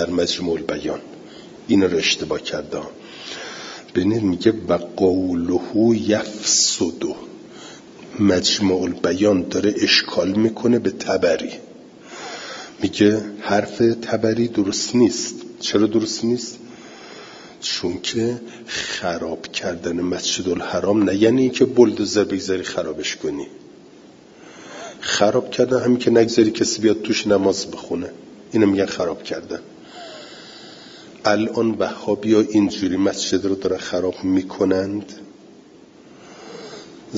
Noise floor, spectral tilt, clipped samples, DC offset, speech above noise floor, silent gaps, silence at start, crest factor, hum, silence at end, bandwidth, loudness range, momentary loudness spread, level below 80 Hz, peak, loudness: -46 dBFS; -4 dB/octave; under 0.1%; under 0.1%; 27 dB; none; 0 s; 20 dB; none; 0 s; 7.8 kHz; 6 LU; 21 LU; -58 dBFS; 0 dBFS; -20 LUFS